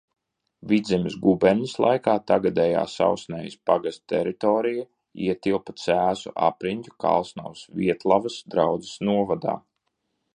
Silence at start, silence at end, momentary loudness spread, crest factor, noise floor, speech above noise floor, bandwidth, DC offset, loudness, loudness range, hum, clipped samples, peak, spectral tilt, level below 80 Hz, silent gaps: 0.65 s; 0.8 s; 9 LU; 20 dB; -76 dBFS; 53 dB; 10 kHz; under 0.1%; -24 LUFS; 3 LU; none; under 0.1%; -4 dBFS; -6.5 dB/octave; -58 dBFS; none